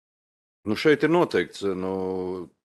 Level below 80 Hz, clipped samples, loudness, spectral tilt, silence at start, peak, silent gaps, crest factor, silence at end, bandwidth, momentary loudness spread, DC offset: -66 dBFS; under 0.1%; -24 LUFS; -6 dB/octave; 0.65 s; -8 dBFS; none; 18 dB; 0.2 s; 12.5 kHz; 11 LU; under 0.1%